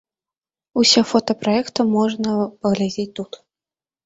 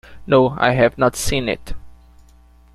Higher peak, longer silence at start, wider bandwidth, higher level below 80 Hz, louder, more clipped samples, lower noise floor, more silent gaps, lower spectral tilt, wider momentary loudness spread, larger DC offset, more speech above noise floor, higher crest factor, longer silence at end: about the same, -2 dBFS vs -2 dBFS; first, 0.75 s vs 0.1 s; second, 8.2 kHz vs 15.5 kHz; second, -60 dBFS vs -36 dBFS; about the same, -19 LUFS vs -17 LUFS; neither; first, under -90 dBFS vs -48 dBFS; neither; about the same, -4 dB/octave vs -5 dB/octave; about the same, 13 LU vs 11 LU; neither; first, over 71 dB vs 32 dB; about the same, 20 dB vs 18 dB; about the same, 0.8 s vs 0.8 s